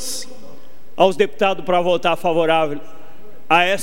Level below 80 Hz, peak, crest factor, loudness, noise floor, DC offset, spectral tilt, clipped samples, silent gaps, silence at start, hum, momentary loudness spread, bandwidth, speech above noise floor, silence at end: -60 dBFS; 0 dBFS; 18 dB; -18 LUFS; -46 dBFS; 6%; -4 dB/octave; under 0.1%; none; 0 s; none; 14 LU; 16 kHz; 29 dB; 0 s